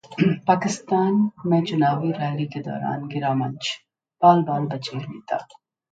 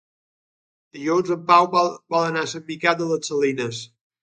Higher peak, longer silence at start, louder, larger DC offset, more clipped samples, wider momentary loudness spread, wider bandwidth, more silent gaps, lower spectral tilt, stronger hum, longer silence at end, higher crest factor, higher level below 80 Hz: about the same, -2 dBFS vs -2 dBFS; second, 0.1 s vs 0.95 s; about the same, -23 LUFS vs -21 LUFS; neither; neither; about the same, 12 LU vs 13 LU; about the same, 9.2 kHz vs 9.4 kHz; neither; first, -6.5 dB/octave vs -4.5 dB/octave; neither; first, 0.5 s vs 0.35 s; about the same, 20 dB vs 22 dB; about the same, -66 dBFS vs -70 dBFS